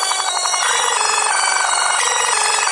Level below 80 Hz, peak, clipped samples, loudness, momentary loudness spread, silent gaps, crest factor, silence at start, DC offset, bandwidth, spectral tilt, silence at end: -62 dBFS; -2 dBFS; under 0.1%; -15 LUFS; 2 LU; none; 14 dB; 0 s; under 0.1%; 11.5 kHz; 3.5 dB/octave; 0 s